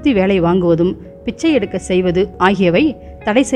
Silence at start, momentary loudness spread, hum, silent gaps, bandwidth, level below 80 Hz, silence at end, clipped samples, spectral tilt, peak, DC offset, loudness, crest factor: 0 s; 6 LU; none; none; 11 kHz; -38 dBFS; 0 s; under 0.1%; -6 dB/octave; 0 dBFS; under 0.1%; -15 LUFS; 14 dB